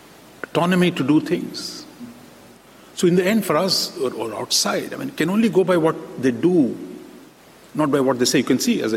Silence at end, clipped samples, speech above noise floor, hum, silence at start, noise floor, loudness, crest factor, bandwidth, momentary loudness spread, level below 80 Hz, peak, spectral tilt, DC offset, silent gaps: 0 s; under 0.1%; 28 dB; none; 0.45 s; -47 dBFS; -20 LUFS; 14 dB; 16.5 kHz; 17 LU; -62 dBFS; -6 dBFS; -4.5 dB/octave; under 0.1%; none